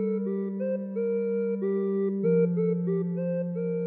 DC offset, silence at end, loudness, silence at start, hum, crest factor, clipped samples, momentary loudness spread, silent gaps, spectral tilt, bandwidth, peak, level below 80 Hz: under 0.1%; 0 s; -28 LUFS; 0 s; none; 12 dB; under 0.1%; 6 LU; none; -12 dB/octave; 2.8 kHz; -14 dBFS; -82 dBFS